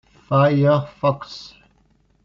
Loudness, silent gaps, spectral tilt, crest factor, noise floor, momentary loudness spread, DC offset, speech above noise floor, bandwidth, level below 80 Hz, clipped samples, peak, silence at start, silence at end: -19 LUFS; none; -6.5 dB/octave; 16 dB; -60 dBFS; 18 LU; under 0.1%; 41 dB; 7 kHz; -56 dBFS; under 0.1%; -4 dBFS; 0.3 s; 0.75 s